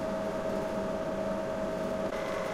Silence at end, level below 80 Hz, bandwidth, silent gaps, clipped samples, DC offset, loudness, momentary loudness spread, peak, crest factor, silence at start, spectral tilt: 0 s; -52 dBFS; 15.5 kHz; none; under 0.1%; under 0.1%; -33 LUFS; 1 LU; -22 dBFS; 12 dB; 0 s; -6 dB/octave